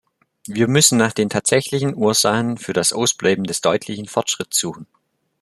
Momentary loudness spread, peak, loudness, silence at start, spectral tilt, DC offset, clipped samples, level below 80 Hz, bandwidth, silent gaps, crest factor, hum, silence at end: 9 LU; 0 dBFS; -18 LUFS; 0.5 s; -3.5 dB/octave; under 0.1%; under 0.1%; -58 dBFS; 13.5 kHz; none; 20 dB; none; 0.6 s